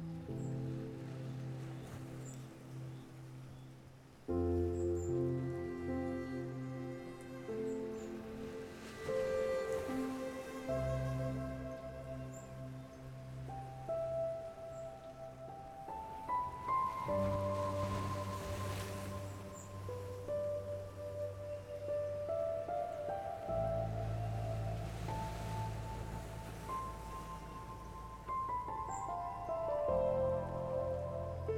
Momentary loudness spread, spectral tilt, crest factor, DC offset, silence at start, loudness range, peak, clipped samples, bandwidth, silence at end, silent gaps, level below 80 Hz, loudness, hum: 12 LU; -7 dB/octave; 16 dB; under 0.1%; 0 s; 6 LU; -24 dBFS; under 0.1%; 17 kHz; 0 s; none; -56 dBFS; -41 LUFS; none